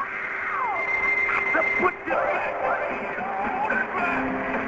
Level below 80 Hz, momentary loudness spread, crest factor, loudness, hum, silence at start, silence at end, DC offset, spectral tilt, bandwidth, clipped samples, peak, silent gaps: -54 dBFS; 7 LU; 16 dB; -24 LUFS; none; 0 s; 0 s; under 0.1%; -5.5 dB/octave; 7.8 kHz; under 0.1%; -10 dBFS; none